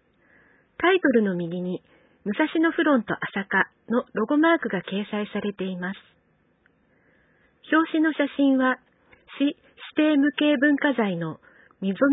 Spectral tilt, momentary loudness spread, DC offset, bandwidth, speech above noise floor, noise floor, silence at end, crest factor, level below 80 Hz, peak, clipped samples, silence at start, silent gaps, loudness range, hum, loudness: -10.5 dB/octave; 12 LU; under 0.1%; 4 kHz; 42 dB; -65 dBFS; 0 s; 18 dB; -68 dBFS; -6 dBFS; under 0.1%; 0.8 s; none; 5 LU; none; -24 LUFS